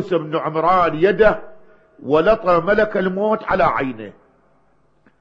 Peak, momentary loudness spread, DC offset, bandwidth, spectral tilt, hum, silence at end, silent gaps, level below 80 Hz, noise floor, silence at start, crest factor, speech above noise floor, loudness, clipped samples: 0 dBFS; 12 LU; under 0.1%; 7 kHz; -8 dB/octave; none; 1.1 s; none; -42 dBFS; -60 dBFS; 0 s; 18 dB; 43 dB; -17 LUFS; under 0.1%